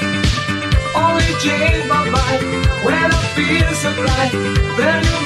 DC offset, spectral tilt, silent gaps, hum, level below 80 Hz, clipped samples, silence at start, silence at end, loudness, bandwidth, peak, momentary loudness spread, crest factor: under 0.1%; -5 dB/octave; none; none; -24 dBFS; under 0.1%; 0 s; 0 s; -15 LUFS; 13.5 kHz; -2 dBFS; 3 LU; 12 dB